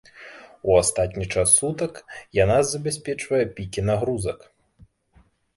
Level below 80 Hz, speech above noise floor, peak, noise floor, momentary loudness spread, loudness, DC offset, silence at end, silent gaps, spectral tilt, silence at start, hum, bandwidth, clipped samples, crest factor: -44 dBFS; 37 dB; -4 dBFS; -59 dBFS; 20 LU; -22 LUFS; under 0.1%; 1.2 s; none; -4 dB/octave; 0.15 s; none; 12 kHz; under 0.1%; 20 dB